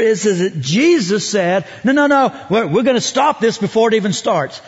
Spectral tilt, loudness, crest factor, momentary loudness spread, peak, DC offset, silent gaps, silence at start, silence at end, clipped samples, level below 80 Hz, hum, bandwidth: -4.5 dB/octave; -15 LUFS; 12 dB; 5 LU; -2 dBFS; under 0.1%; none; 0 s; 0.05 s; under 0.1%; -60 dBFS; none; 8 kHz